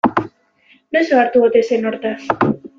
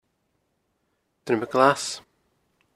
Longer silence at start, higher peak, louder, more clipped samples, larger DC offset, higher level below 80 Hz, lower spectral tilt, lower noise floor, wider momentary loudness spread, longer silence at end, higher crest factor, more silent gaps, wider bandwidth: second, 0.05 s vs 1.25 s; about the same, 0 dBFS vs -2 dBFS; first, -16 LUFS vs -23 LUFS; neither; neither; first, -56 dBFS vs -70 dBFS; first, -6.5 dB/octave vs -4 dB/octave; second, -54 dBFS vs -74 dBFS; second, 10 LU vs 18 LU; second, 0.1 s vs 0.75 s; second, 16 dB vs 26 dB; neither; second, 7.4 kHz vs 15 kHz